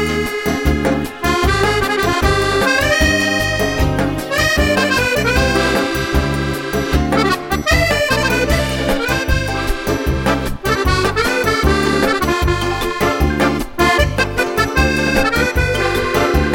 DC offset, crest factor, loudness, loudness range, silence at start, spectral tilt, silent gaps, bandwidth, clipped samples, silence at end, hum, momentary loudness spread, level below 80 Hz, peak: under 0.1%; 14 dB; -15 LUFS; 2 LU; 0 s; -4.5 dB/octave; none; 17 kHz; under 0.1%; 0 s; none; 5 LU; -24 dBFS; 0 dBFS